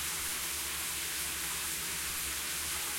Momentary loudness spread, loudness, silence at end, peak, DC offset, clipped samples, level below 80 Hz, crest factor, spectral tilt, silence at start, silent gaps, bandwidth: 0 LU; -33 LUFS; 0 s; -24 dBFS; under 0.1%; under 0.1%; -56 dBFS; 14 dB; 0 dB/octave; 0 s; none; 16.5 kHz